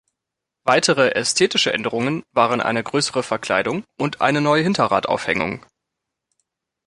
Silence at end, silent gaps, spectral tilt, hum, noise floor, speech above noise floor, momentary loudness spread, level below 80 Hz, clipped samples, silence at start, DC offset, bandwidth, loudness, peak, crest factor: 1.3 s; none; -3.5 dB/octave; none; -83 dBFS; 64 dB; 8 LU; -58 dBFS; under 0.1%; 0.65 s; under 0.1%; 11.5 kHz; -19 LUFS; -2 dBFS; 20 dB